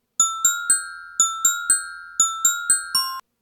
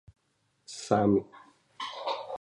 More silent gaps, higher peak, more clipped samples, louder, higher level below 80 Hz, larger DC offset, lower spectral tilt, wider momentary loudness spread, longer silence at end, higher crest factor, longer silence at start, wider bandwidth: neither; first, -6 dBFS vs -10 dBFS; neither; first, -19 LUFS vs -30 LUFS; about the same, -66 dBFS vs -62 dBFS; neither; second, 3.5 dB/octave vs -6 dB/octave; second, 5 LU vs 19 LU; first, 0.2 s vs 0.05 s; second, 16 dB vs 22 dB; second, 0.2 s vs 0.7 s; first, over 20 kHz vs 11.5 kHz